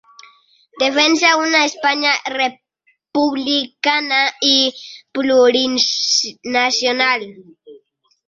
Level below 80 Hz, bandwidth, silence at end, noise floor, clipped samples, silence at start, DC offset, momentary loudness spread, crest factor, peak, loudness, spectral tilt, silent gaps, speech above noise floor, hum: -66 dBFS; 7.6 kHz; 0.5 s; -62 dBFS; under 0.1%; 0.75 s; under 0.1%; 8 LU; 16 dB; 0 dBFS; -15 LUFS; -0.5 dB/octave; none; 46 dB; none